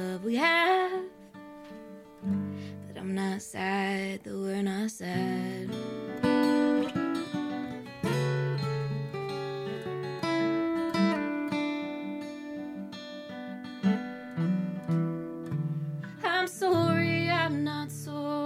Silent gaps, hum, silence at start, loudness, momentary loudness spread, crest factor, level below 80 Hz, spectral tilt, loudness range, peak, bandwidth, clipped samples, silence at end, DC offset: none; none; 0 s; -30 LUFS; 14 LU; 18 dB; -68 dBFS; -6 dB/octave; 5 LU; -12 dBFS; 15.5 kHz; under 0.1%; 0 s; under 0.1%